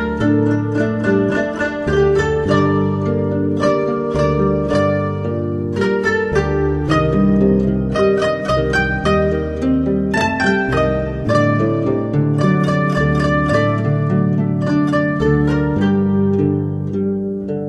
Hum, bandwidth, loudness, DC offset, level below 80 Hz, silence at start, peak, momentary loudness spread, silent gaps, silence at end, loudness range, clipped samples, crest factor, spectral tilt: none; 10 kHz; -16 LUFS; under 0.1%; -32 dBFS; 0 s; -2 dBFS; 4 LU; none; 0 s; 1 LU; under 0.1%; 14 dB; -7.5 dB/octave